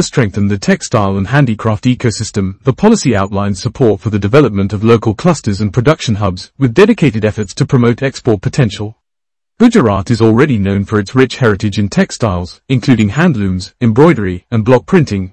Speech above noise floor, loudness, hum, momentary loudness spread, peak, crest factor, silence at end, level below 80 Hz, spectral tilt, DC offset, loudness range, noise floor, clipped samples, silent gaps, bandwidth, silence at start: 75 dB; -12 LUFS; none; 7 LU; 0 dBFS; 12 dB; 0.05 s; -40 dBFS; -6.5 dB/octave; 0.2%; 1 LU; -86 dBFS; 1%; none; 9.4 kHz; 0 s